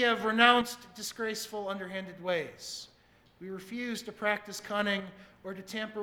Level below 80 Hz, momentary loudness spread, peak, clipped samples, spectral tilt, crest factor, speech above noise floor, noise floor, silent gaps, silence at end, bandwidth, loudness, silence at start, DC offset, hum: -70 dBFS; 21 LU; -6 dBFS; under 0.1%; -3 dB/octave; 26 dB; 28 dB; -60 dBFS; none; 0 s; 18 kHz; -31 LUFS; 0 s; under 0.1%; none